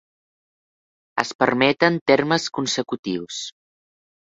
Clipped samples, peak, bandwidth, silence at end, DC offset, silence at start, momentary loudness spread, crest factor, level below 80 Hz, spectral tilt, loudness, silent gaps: under 0.1%; 0 dBFS; 8 kHz; 0.75 s; under 0.1%; 1.15 s; 13 LU; 22 dB; -62 dBFS; -4 dB/octave; -21 LUFS; 1.35-1.39 s, 2.01-2.06 s, 2.99-3.03 s